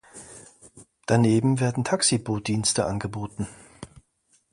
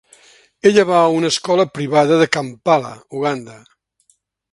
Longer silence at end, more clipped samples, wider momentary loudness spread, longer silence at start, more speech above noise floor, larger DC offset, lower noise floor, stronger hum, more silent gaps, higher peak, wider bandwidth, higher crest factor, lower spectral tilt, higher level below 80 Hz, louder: second, 0.65 s vs 0.95 s; neither; first, 24 LU vs 9 LU; second, 0.15 s vs 0.65 s; about the same, 43 dB vs 46 dB; neither; first, -67 dBFS vs -61 dBFS; neither; neither; second, -6 dBFS vs 0 dBFS; about the same, 11.5 kHz vs 11.5 kHz; about the same, 20 dB vs 18 dB; about the same, -4.5 dB/octave vs -5 dB/octave; first, -54 dBFS vs -62 dBFS; second, -24 LUFS vs -16 LUFS